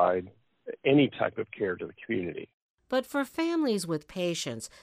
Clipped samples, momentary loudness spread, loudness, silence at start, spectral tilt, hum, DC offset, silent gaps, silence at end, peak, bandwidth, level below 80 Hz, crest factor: under 0.1%; 17 LU; -30 LUFS; 0 s; -5 dB/octave; none; under 0.1%; 2.54-2.75 s; 0.15 s; -10 dBFS; 15.5 kHz; -68 dBFS; 18 dB